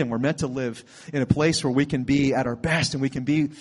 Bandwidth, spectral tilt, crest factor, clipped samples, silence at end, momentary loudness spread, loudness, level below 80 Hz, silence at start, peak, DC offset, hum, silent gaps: 11.5 kHz; -5.5 dB/octave; 20 dB; under 0.1%; 0 s; 9 LU; -24 LUFS; -50 dBFS; 0 s; -4 dBFS; under 0.1%; none; none